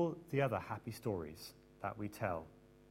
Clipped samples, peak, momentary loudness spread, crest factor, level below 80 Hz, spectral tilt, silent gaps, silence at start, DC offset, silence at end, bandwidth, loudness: under 0.1%; -20 dBFS; 15 LU; 20 dB; -68 dBFS; -6.5 dB/octave; none; 0 s; under 0.1%; 0.05 s; 16 kHz; -41 LUFS